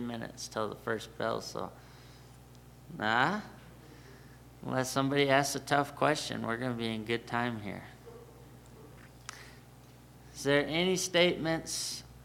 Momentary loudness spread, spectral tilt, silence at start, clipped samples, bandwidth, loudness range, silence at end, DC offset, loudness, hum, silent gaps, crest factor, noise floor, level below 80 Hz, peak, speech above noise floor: 26 LU; -4 dB/octave; 0 s; under 0.1%; 19 kHz; 8 LU; 0 s; under 0.1%; -32 LUFS; none; none; 24 dB; -55 dBFS; -62 dBFS; -10 dBFS; 23 dB